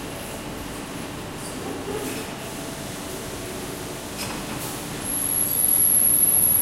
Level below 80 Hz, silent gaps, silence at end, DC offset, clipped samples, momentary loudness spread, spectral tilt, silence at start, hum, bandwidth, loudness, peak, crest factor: -48 dBFS; none; 0 s; under 0.1%; under 0.1%; 18 LU; -2 dB/octave; 0 s; none; 16 kHz; -22 LUFS; -8 dBFS; 18 dB